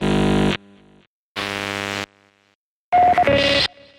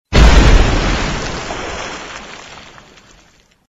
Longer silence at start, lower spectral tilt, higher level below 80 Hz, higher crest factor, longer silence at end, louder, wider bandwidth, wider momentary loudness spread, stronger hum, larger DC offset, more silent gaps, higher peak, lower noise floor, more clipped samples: about the same, 0 s vs 0.1 s; about the same, -5 dB/octave vs -5 dB/octave; second, -40 dBFS vs -16 dBFS; about the same, 16 dB vs 14 dB; second, 0.3 s vs 1.1 s; second, -19 LUFS vs -14 LUFS; first, 16.5 kHz vs 8 kHz; second, 13 LU vs 23 LU; neither; neither; first, 1.07-1.35 s, 2.55-2.92 s vs none; second, -6 dBFS vs 0 dBFS; first, -66 dBFS vs -50 dBFS; second, under 0.1% vs 0.3%